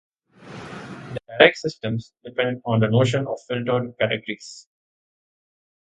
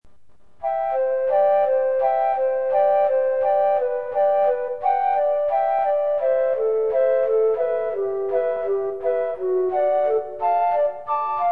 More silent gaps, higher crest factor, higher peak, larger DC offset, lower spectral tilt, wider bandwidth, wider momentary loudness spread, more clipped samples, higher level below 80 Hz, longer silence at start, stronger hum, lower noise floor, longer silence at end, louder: neither; first, 24 dB vs 10 dB; first, 0 dBFS vs -10 dBFS; second, under 0.1% vs 0.6%; second, -6 dB/octave vs -7.5 dB/octave; first, 9.2 kHz vs 4.2 kHz; first, 21 LU vs 5 LU; neither; about the same, -60 dBFS vs -62 dBFS; first, 0.4 s vs 0 s; neither; second, -43 dBFS vs -58 dBFS; first, 1.25 s vs 0 s; about the same, -22 LUFS vs -21 LUFS